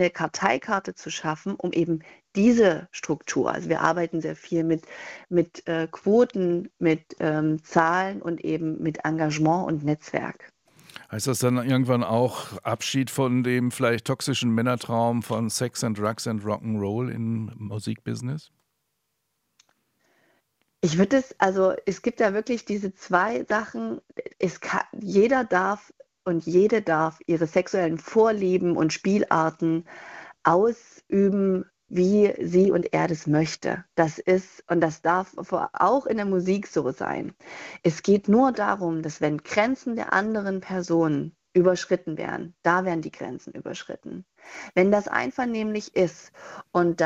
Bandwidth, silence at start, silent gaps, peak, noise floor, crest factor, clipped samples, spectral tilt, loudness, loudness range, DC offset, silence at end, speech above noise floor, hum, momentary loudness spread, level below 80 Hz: 15.5 kHz; 0 s; none; -4 dBFS; -77 dBFS; 22 dB; under 0.1%; -6 dB/octave; -24 LUFS; 4 LU; under 0.1%; 0 s; 53 dB; none; 11 LU; -62 dBFS